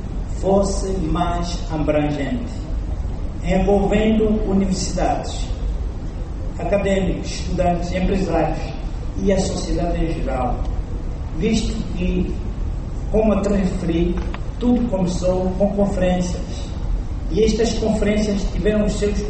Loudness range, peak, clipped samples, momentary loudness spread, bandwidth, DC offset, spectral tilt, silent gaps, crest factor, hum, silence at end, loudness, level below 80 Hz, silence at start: 3 LU; -6 dBFS; under 0.1%; 10 LU; 8.8 kHz; under 0.1%; -6.5 dB/octave; none; 14 dB; none; 0 s; -21 LUFS; -24 dBFS; 0 s